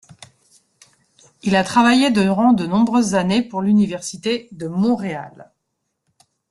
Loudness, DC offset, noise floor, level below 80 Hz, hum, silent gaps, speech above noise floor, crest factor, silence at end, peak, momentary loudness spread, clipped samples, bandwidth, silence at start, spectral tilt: -18 LUFS; under 0.1%; -75 dBFS; -56 dBFS; none; none; 58 dB; 16 dB; 1.1 s; -2 dBFS; 12 LU; under 0.1%; 12 kHz; 1.45 s; -5.5 dB/octave